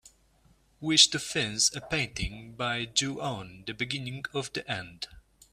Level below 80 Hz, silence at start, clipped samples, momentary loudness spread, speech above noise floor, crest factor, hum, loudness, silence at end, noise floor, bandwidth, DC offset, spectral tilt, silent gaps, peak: -52 dBFS; 0.05 s; under 0.1%; 18 LU; 34 dB; 28 dB; none; -28 LUFS; 0.35 s; -64 dBFS; 15 kHz; under 0.1%; -2 dB/octave; none; -4 dBFS